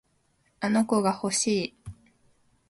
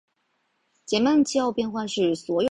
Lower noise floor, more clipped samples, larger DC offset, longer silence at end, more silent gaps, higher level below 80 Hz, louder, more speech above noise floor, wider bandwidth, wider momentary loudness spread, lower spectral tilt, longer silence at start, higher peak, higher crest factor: about the same, -69 dBFS vs -72 dBFS; neither; neither; first, 0.75 s vs 0.05 s; neither; about the same, -60 dBFS vs -62 dBFS; about the same, -26 LUFS vs -24 LUFS; second, 44 dB vs 49 dB; about the same, 11.5 kHz vs 10.5 kHz; first, 18 LU vs 7 LU; about the same, -4 dB/octave vs -4.5 dB/octave; second, 0.6 s vs 0.9 s; second, -12 dBFS vs -8 dBFS; about the same, 18 dB vs 16 dB